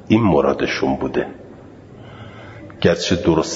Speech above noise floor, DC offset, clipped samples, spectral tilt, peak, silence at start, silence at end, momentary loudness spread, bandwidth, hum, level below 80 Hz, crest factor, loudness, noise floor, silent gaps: 23 dB; under 0.1%; under 0.1%; -5.5 dB/octave; 0 dBFS; 0.05 s; 0 s; 22 LU; 8 kHz; none; -44 dBFS; 20 dB; -18 LUFS; -40 dBFS; none